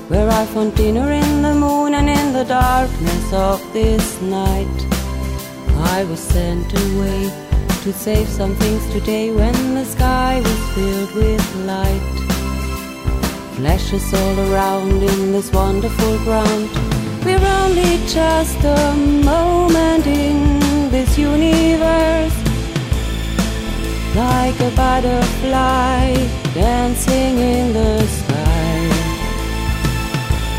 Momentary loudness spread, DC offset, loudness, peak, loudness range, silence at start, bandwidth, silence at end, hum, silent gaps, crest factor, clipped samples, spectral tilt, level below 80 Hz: 7 LU; under 0.1%; -17 LUFS; -4 dBFS; 5 LU; 0 s; 16.5 kHz; 0 s; none; none; 12 dB; under 0.1%; -5.5 dB/octave; -22 dBFS